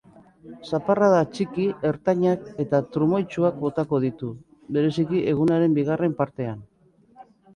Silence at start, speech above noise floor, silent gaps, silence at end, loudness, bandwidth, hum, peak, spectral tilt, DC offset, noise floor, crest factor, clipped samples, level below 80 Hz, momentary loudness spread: 0.45 s; 34 dB; none; 0.35 s; -23 LUFS; 10.5 kHz; none; -6 dBFS; -8.5 dB/octave; under 0.1%; -57 dBFS; 18 dB; under 0.1%; -60 dBFS; 12 LU